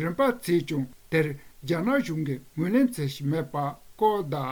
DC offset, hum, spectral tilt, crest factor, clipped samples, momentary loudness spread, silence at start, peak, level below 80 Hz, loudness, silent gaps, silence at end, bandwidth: under 0.1%; none; -7 dB/octave; 16 dB; under 0.1%; 8 LU; 0 s; -10 dBFS; -58 dBFS; -27 LUFS; none; 0 s; over 20 kHz